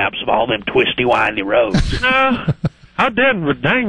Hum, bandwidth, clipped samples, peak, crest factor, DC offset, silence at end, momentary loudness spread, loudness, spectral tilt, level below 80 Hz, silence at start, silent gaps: none; 11 kHz; under 0.1%; -2 dBFS; 14 dB; under 0.1%; 0 s; 5 LU; -16 LUFS; -6 dB/octave; -30 dBFS; 0 s; none